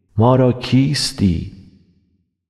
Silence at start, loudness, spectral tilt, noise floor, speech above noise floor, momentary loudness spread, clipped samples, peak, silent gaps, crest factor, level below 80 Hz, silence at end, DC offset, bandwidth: 0.15 s; -16 LUFS; -6 dB/octave; -64 dBFS; 49 dB; 9 LU; under 0.1%; -4 dBFS; none; 14 dB; -42 dBFS; 0.9 s; under 0.1%; 13 kHz